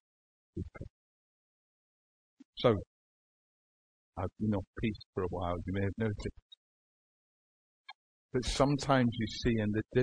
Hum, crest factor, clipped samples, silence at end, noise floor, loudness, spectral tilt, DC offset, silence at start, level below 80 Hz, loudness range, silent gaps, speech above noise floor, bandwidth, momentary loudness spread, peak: none; 22 dB; under 0.1%; 0 s; under -90 dBFS; -34 LUFS; -6 dB/octave; 0.1%; 0.55 s; -52 dBFS; 6 LU; 0.90-2.37 s, 2.45-2.53 s, 2.87-4.13 s, 4.67-4.73 s, 5.05-5.13 s, 6.42-6.50 s, 6.57-7.84 s, 7.95-8.29 s; over 58 dB; 10.5 kHz; 17 LU; -14 dBFS